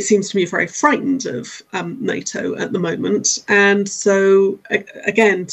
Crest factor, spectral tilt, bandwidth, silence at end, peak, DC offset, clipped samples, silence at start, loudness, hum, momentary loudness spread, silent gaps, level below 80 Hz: 16 dB; -3.5 dB/octave; 8.6 kHz; 0 s; 0 dBFS; under 0.1%; under 0.1%; 0 s; -17 LUFS; none; 10 LU; none; -64 dBFS